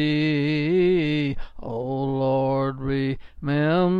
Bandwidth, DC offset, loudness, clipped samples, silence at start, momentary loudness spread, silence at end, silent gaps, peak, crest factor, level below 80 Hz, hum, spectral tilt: 6.8 kHz; under 0.1%; -23 LUFS; under 0.1%; 0 s; 10 LU; 0 s; none; -10 dBFS; 12 dB; -42 dBFS; none; -9 dB/octave